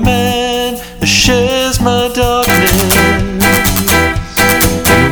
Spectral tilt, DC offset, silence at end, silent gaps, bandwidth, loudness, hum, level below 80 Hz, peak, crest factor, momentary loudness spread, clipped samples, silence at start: -3.5 dB/octave; under 0.1%; 0 s; none; over 20 kHz; -10 LUFS; 60 Hz at -35 dBFS; -24 dBFS; 0 dBFS; 10 dB; 5 LU; 0.1%; 0 s